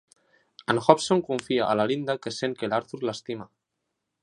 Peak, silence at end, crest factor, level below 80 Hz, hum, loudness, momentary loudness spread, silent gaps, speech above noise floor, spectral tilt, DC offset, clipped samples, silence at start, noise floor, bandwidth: 0 dBFS; 0.75 s; 26 dB; -68 dBFS; none; -25 LUFS; 15 LU; none; 56 dB; -5 dB/octave; under 0.1%; under 0.1%; 0.7 s; -81 dBFS; 11.5 kHz